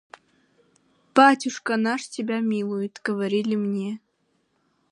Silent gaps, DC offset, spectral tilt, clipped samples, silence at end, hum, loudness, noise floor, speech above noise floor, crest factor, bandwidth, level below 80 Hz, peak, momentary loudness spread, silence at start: none; under 0.1%; -5 dB/octave; under 0.1%; 0.95 s; none; -23 LUFS; -70 dBFS; 47 dB; 22 dB; 11.5 kHz; -78 dBFS; -2 dBFS; 12 LU; 1.15 s